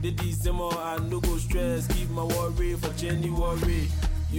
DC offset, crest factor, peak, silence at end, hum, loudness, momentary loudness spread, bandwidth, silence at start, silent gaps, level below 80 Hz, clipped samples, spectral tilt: under 0.1%; 10 dB; -16 dBFS; 0 s; none; -28 LUFS; 2 LU; 17 kHz; 0 s; none; -30 dBFS; under 0.1%; -6 dB/octave